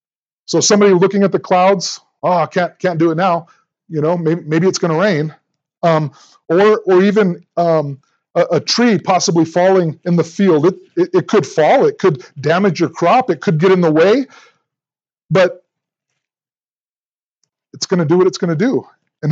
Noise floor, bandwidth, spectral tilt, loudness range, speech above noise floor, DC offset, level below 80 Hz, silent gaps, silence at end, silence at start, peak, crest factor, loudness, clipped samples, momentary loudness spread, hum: under -90 dBFS; 8 kHz; -5.5 dB/octave; 6 LU; over 77 dB; under 0.1%; -72 dBFS; 16.70-17.41 s; 0 s; 0.5 s; 0 dBFS; 14 dB; -14 LUFS; under 0.1%; 8 LU; none